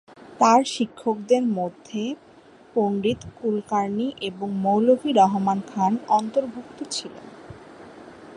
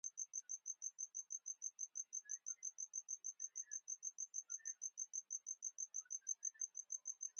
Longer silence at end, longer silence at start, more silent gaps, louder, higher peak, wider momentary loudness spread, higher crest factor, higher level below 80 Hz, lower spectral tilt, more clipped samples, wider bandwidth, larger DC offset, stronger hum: about the same, 0 s vs 0 s; first, 0.2 s vs 0.05 s; neither; first, -23 LUFS vs -47 LUFS; first, -4 dBFS vs -32 dBFS; first, 23 LU vs 3 LU; about the same, 20 dB vs 18 dB; first, -62 dBFS vs under -90 dBFS; first, -5.5 dB/octave vs 5.5 dB/octave; neither; first, 11.5 kHz vs 10 kHz; neither; neither